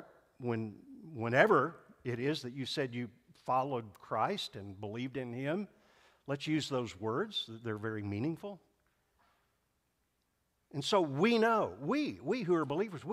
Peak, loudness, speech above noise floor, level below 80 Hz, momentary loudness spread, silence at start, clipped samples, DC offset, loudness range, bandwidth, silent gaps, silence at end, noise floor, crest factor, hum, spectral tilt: -10 dBFS; -35 LUFS; 45 dB; -74 dBFS; 16 LU; 0 s; under 0.1%; under 0.1%; 7 LU; 15 kHz; none; 0 s; -80 dBFS; 24 dB; none; -5.5 dB/octave